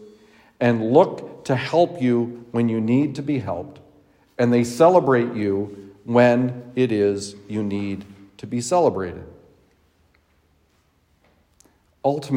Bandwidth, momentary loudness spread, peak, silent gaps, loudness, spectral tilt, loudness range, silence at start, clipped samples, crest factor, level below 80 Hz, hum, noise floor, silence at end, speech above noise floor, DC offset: 16 kHz; 16 LU; -2 dBFS; none; -21 LUFS; -6.5 dB/octave; 8 LU; 0 s; under 0.1%; 20 dB; -64 dBFS; none; -63 dBFS; 0 s; 43 dB; under 0.1%